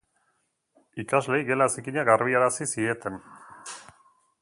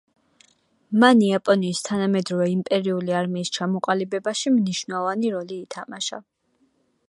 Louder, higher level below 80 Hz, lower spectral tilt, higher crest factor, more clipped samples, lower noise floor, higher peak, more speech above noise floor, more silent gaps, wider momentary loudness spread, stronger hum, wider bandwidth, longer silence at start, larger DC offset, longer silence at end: second, -25 LUFS vs -22 LUFS; about the same, -68 dBFS vs -70 dBFS; about the same, -4.5 dB/octave vs -5 dB/octave; about the same, 24 dB vs 22 dB; neither; first, -73 dBFS vs -66 dBFS; about the same, -4 dBFS vs -2 dBFS; first, 49 dB vs 44 dB; neither; first, 21 LU vs 12 LU; neither; about the same, 11.5 kHz vs 11.5 kHz; about the same, 0.95 s vs 0.9 s; neither; second, 0.6 s vs 0.85 s